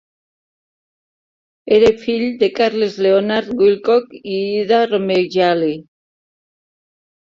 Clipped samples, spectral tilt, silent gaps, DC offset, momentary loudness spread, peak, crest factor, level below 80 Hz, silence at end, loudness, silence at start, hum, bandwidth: under 0.1%; -6 dB/octave; none; under 0.1%; 7 LU; -2 dBFS; 16 dB; -56 dBFS; 1.45 s; -16 LUFS; 1.65 s; none; 7.4 kHz